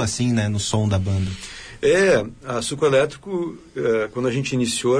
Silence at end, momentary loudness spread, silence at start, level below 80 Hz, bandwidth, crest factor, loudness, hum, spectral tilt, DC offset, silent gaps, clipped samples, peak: 0 s; 10 LU; 0 s; -46 dBFS; 10.5 kHz; 14 dB; -21 LUFS; none; -5 dB/octave; under 0.1%; none; under 0.1%; -6 dBFS